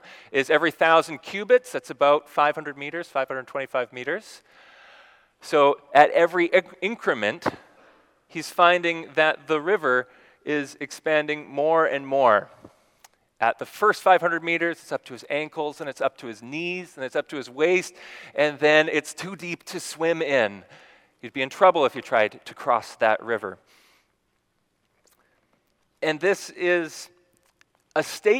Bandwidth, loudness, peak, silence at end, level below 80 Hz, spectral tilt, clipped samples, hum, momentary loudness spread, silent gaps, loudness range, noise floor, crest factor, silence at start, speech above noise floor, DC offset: 17 kHz; -23 LUFS; 0 dBFS; 0 s; -78 dBFS; -4 dB/octave; under 0.1%; none; 15 LU; none; 7 LU; -72 dBFS; 24 dB; 0.1 s; 48 dB; under 0.1%